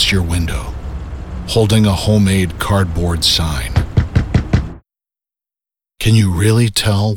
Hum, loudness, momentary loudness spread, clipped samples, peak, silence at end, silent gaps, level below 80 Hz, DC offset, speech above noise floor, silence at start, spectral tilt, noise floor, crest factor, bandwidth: none; -15 LUFS; 14 LU; under 0.1%; -2 dBFS; 0 s; none; -26 dBFS; under 0.1%; 74 dB; 0 s; -5 dB/octave; -87 dBFS; 14 dB; 17.5 kHz